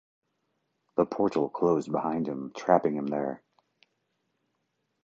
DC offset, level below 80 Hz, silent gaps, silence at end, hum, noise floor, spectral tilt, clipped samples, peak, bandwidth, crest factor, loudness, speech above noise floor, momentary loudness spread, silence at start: under 0.1%; -68 dBFS; none; 1.65 s; none; -78 dBFS; -7.5 dB/octave; under 0.1%; -6 dBFS; 7.8 kHz; 24 dB; -28 LUFS; 51 dB; 9 LU; 0.95 s